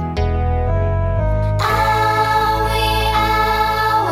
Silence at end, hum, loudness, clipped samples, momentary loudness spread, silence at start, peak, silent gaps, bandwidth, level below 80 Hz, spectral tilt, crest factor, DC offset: 0 s; none; -17 LUFS; under 0.1%; 4 LU; 0 s; -4 dBFS; none; 16.5 kHz; -24 dBFS; -5.5 dB/octave; 12 dB; under 0.1%